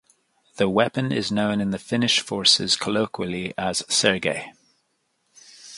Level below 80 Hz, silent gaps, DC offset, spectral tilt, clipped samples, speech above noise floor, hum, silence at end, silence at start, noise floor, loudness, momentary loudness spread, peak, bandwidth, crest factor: -58 dBFS; none; under 0.1%; -3 dB/octave; under 0.1%; 48 dB; none; 0 s; 0.55 s; -71 dBFS; -22 LUFS; 10 LU; -2 dBFS; 11.5 kHz; 22 dB